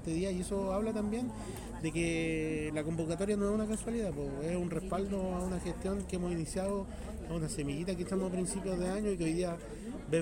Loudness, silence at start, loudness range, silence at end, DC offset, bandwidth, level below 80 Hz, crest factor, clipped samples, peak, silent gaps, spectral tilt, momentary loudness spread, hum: -36 LUFS; 0 s; 2 LU; 0 s; under 0.1%; 16 kHz; -48 dBFS; 16 dB; under 0.1%; -20 dBFS; none; -6 dB/octave; 6 LU; none